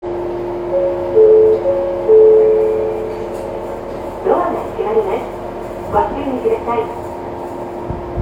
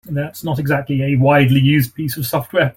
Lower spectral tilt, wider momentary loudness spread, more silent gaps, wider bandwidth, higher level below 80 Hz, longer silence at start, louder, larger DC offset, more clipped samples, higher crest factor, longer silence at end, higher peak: first, -8 dB/octave vs -6.5 dB/octave; first, 16 LU vs 10 LU; neither; second, 7.8 kHz vs 17 kHz; first, -40 dBFS vs -46 dBFS; about the same, 0 s vs 0.05 s; about the same, -16 LUFS vs -16 LUFS; neither; neither; about the same, 14 dB vs 14 dB; about the same, 0 s vs 0.05 s; about the same, 0 dBFS vs -2 dBFS